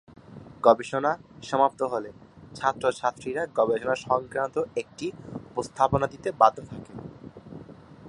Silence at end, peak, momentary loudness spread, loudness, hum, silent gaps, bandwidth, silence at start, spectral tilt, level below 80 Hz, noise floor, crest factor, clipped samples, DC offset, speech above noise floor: 0 s; -4 dBFS; 22 LU; -26 LUFS; none; none; 11.5 kHz; 0.3 s; -5.5 dB/octave; -56 dBFS; -46 dBFS; 24 dB; under 0.1%; under 0.1%; 21 dB